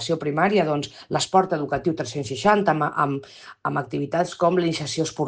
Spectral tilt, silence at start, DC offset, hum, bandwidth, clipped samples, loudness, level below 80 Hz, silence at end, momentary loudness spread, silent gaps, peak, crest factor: -5 dB/octave; 0 s; under 0.1%; none; 10 kHz; under 0.1%; -23 LUFS; -58 dBFS; 0 s; 8 LU; none; -6 dBFS; 18 dB